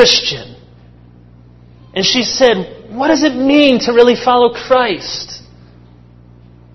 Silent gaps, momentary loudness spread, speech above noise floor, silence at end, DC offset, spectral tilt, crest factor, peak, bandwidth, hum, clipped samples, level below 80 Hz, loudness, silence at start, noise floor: none; 15 LU; 29 dB; 1.35 s; under 0.1%; -3.5 dB/octave; 14 dB; 0 dBFS; 6.2 kHz; 60 Hz at -35 dBFS; 0.2%; -46 dBFS; -12 LUFS; 0 s; -41 dBFS